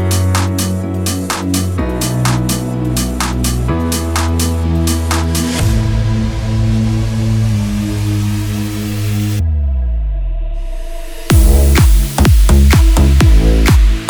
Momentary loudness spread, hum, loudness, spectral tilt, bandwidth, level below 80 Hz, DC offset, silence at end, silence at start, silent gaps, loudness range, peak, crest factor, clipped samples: 9 LU; none; -14 LUFS; -5.5 dB/octave; over 20 kHz; -14 dBFS; under 0.1%; 0 s; 0 s; none; 6 LU; 0 dBFS; 12 dB; under 0.1%